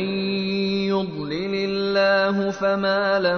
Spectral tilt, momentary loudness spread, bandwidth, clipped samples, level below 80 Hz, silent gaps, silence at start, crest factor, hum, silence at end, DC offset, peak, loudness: -6 dB/octave; 6 LU; 6.6 kHz; under 0.1%; -56 dBFS; none; 0 s; 14 dB; none; 0 s; under 0.1%; -8 dBFS; -22 LUFS